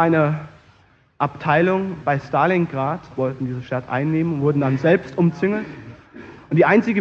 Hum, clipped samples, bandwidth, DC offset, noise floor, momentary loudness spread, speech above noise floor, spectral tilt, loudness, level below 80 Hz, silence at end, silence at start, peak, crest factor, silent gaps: none; under 0.1%; 7 kHz; under 0.1%; -55 dBFS; 12 LU; 36 dB; -9 dB/octave; -20 LUFS; -56 dBFS; 0 s; 0 s; -2 dBFS; 18 dB; none